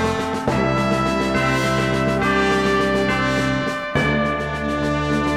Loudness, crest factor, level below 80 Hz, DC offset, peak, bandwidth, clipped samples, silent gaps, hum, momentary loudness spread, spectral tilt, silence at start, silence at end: -19 LUFS; 14 dB; -36 dBFS; under 0.1%; -6 dBFS; 15 kHz; under 0.1%; none; none; 4 LU; -5.5 dB/octave; 0 s; 0 s